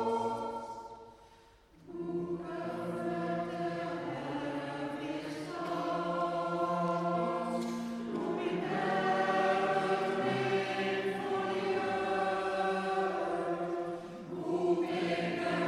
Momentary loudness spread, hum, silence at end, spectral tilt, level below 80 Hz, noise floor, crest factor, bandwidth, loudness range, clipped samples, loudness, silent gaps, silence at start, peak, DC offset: 8 LU; none; 0 s; -6 dB/octave; -70 dBFS; -60 dBFS; 16 dB; 13 kHz; 6 LU; under 0.1%; -34 LUFS; none; 0 s; -18 dBFS; under 0.1%